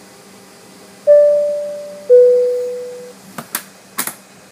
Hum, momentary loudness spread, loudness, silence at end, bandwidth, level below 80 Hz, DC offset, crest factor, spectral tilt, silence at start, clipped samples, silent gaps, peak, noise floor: none; 21 LU; -14 LUFS; 0.4 s; 15.5 kHz; -72 dBFS; under 0.1%; 14 dB; -2.5 dB/octave; 1.05 s; under 0.1%; none; 0 dBFS; -41 dBFS